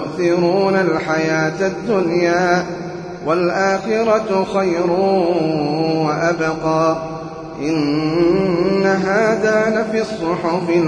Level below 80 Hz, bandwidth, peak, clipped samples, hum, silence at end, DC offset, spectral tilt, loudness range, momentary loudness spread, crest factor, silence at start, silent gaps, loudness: -50 dBFS; 10 kHz; -4 dBFS; under 0.1%; none; 0 s; under 0.1%; -6 dB/octave; 1 LU; 5 LU; 14 dB; 0 s; none; -17 LUFS